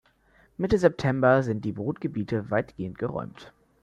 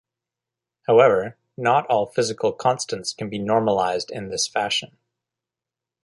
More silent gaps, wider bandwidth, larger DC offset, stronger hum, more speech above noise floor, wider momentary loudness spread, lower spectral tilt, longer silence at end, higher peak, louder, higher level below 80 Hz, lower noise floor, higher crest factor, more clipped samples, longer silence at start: neither; second, 10 kHz vs 11.5 kHz; neither; neither; second, 36 dB vs 67 dB; about the same, 14 LU vs 12 LU; first, -8 dB/octave vs -3.5 dB/octave; second, 0.35 s vs 1.2 s; second, -6 dBFS vs -2 dBFS; second, -26 LUFS vs -21 LUFS; first, -52 dBFS vs -62 dBFS; second, -61 dBFS vs -88 dBFS; about the same, 20 dB vs 20 dB; neither; second, 0.6 s vs 0.9 s